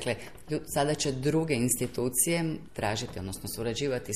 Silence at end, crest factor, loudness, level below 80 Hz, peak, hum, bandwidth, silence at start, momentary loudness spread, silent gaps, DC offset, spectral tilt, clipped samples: 0 s; 18 dB; -30 LUFS; -54 dBFS; -12 dBFS; none; 15 kHz; 0 s; 10 LU; none; 0.4%; -4 dB/octave; under 0.1%